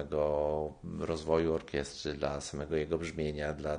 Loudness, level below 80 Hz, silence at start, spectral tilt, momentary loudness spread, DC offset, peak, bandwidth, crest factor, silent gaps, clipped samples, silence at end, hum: -34 LUFS; -50 dBFS; 0 s; -5.5 dB/octave; 8 LU; under 0.1%; -14 dBFS; 10 kHz; 20 dB; none; under 0.1%; 0 s; none